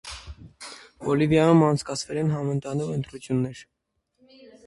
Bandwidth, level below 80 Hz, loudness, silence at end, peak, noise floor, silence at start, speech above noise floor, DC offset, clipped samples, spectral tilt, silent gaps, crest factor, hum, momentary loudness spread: 11.5 kHz; -52 dBFS; -24 LUFS; 1.05 s; -6 dBFS; -73 dBFS; 0.05 s; 50 dB; under 0.1%; under 0.1%; -6.5 dB/octave; none; 18 dB; none; 23 LU